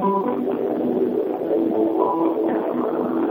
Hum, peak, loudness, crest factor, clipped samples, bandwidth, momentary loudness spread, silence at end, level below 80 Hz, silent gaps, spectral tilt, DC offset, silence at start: none; -4 dBFS; -22 LUFS; 16 dB; under 0.1%; 16 kHz; 3 LU; 0 s; -62 dBFS; none; -10 dB/octave; under 0.1%; 0 s